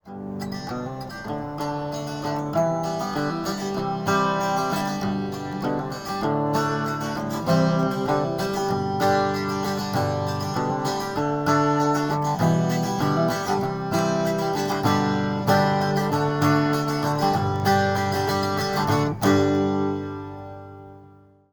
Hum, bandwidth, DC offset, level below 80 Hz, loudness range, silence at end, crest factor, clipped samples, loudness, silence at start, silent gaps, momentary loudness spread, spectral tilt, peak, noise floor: none; 19 kHz; under 0.1%; -54 dBFS; 4 LU; 0.4 s; 18 dB; under 0.1%; -24 LUFS; 0.05 s; none; 10 LU; -6 dB/octave; -6 dBFS; -51 dBFS